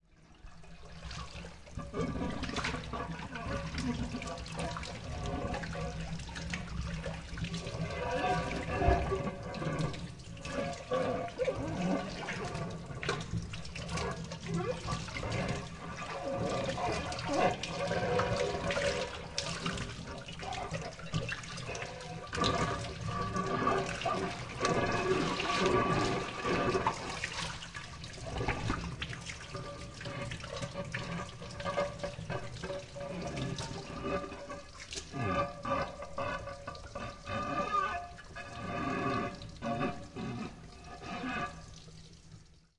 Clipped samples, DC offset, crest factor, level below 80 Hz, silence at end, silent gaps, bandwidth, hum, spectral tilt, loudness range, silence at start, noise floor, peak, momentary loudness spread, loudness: under 0.1%; under 0.1%; 22 dB; -48 dBFS; 0.2 s; none; 11.5 kHz; none; -5 dB/octave; 7 LU; 0.1 s; -56 dBFS; -14 dBFS; 12 LU; -36 LUFS